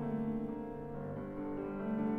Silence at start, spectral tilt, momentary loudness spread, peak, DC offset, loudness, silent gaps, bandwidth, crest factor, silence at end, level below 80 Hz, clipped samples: 0 s; -10.5 dB/octave; 6 LU; -24 dBFS; under 0.1%; -40 LUFS; none; 3.8 kHz; 14 dB; 0 s; -58 dBFS; under 0.1%